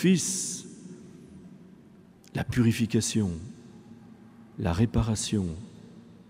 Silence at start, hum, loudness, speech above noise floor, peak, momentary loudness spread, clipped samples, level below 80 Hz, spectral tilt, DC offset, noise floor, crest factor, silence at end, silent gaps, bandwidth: 0 s; none; -28 LUFS; 27 dB; -10 dBFS; 24 LU; under 0.1%; -48 dBFS; -5 dB/octave; under 0.1%; -54 dBFS; 18 dB; 0.1 s; none; 16 kHz